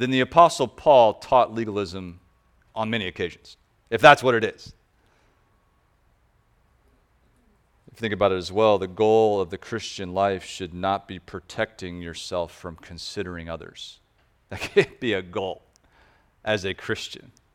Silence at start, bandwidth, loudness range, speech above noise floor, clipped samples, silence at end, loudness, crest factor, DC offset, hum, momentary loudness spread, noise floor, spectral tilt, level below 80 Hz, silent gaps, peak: 0 s; 15 kHz; 9 LU; 41 dB; under 0.1%; 0.35 s; -23 LUFS; 24 dB; under 0.1%; none; 20 LU; -64 dBFS; -5 dB/octave; -56 dBFS; none; 0 dBFS